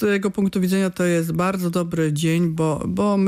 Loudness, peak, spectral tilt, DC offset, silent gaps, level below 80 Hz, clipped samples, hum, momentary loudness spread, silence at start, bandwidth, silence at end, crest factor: -21 LUFS; -8 dBFS; -6.5 dB/octave; under 0.1%; none; -52 dBFS; under 0.1%; none; 2 LU; 0 s; 15.5 kHz; 0 s; 12 dB